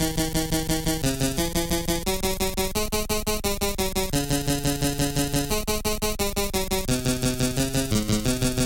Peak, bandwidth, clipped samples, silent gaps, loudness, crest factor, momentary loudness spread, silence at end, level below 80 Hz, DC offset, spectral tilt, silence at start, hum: -10 dBFS; 17 kHz; under 0.1%; none; -25 LUFS; 14 dB; 2 LU; 0 s; -32 dBFS; under 0.1%; -4 dB/octave; 0 s; none